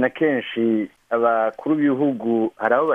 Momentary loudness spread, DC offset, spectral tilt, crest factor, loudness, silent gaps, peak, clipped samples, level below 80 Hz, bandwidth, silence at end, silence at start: 3 LU; under 0.1%; -8 dB/octave; 16 dB; -21 LUFS; none; -6 dBFS; under 0.1%; -70 dBFS; 3.8 kHz; 0 s; 0 s